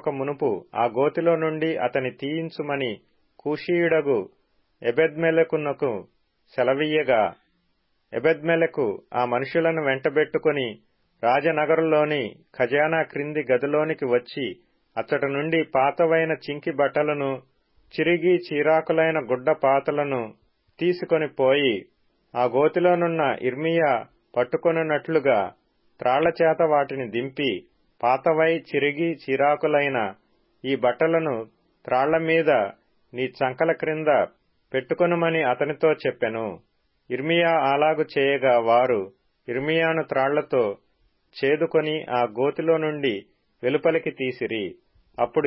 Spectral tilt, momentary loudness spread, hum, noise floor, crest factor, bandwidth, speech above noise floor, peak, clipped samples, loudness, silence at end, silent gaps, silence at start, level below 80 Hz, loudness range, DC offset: -10.5 dB/octave; 10 LU; none; -69 dBFS; 16 dB; 5.8 kHz; 47 dB; -8 dBFS; under 0.1%; -23 LUFS; 0 s; none; 0.05 s; -68 dBFS; 2 LU; under 0.1%